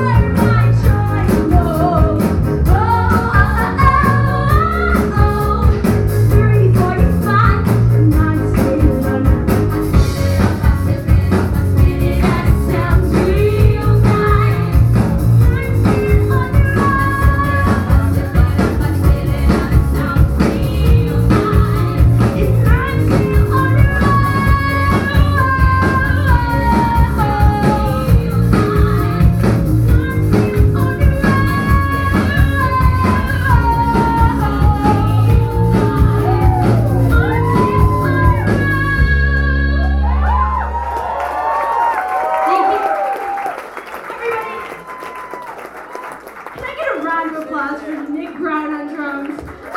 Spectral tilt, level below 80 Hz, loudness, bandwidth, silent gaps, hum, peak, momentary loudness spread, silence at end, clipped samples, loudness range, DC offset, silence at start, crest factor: -8 dB/octave; -18 dBFS; -14 LUFS; 17 kHz; none; none; 0 dBFS; 9 LU; 0 s; under 0.1%; 6 LU; under 0.1%; 0 s; 12 dB